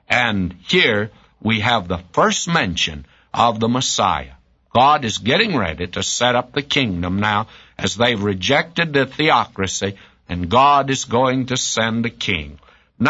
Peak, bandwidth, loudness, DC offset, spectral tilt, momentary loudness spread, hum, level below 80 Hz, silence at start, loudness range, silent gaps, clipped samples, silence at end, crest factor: -2 dBFS; 8 kHz; -18 LUFS; under 0.1%; -3.5 dB/octave; 9 LU; none; -44 dBFS; 0.1 s; 1 LU; none; under 0.1%; 0 s; 18 dB